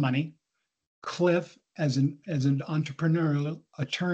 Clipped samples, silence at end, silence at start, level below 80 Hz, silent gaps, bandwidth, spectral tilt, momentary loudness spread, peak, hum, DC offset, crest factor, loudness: under 0.1%; 0 s; 0 s; -70 dBFS; 0.87-1.02 s; 8.2 kHz; -7 dB/octave; 12 LU; -12 dBFS; none; under 0.1%; 16 dB; -29 LUFS